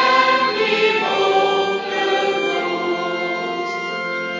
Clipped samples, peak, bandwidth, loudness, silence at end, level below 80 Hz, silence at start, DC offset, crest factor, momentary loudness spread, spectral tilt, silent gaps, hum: under 0.1%; -2 dBFS; 7.6 kHz; -18 LUFS; 0 s; -64 dBFS; 0 s; under 0.1%; 18 dB; 7 LU; -3.5 dB/octave; none; none